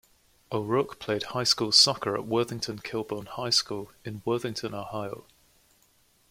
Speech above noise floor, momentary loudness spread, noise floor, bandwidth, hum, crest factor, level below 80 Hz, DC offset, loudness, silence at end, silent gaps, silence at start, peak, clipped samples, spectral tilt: 36 dB; 17 LU; -65 dBFS; 16.5 kHz; none; 24 dB; -64 dBFS; under 0.1%; -27 LUFS; 1.1 s; none; 0.5 s; -6 dBFS; under 0.1%; -3 dB/octave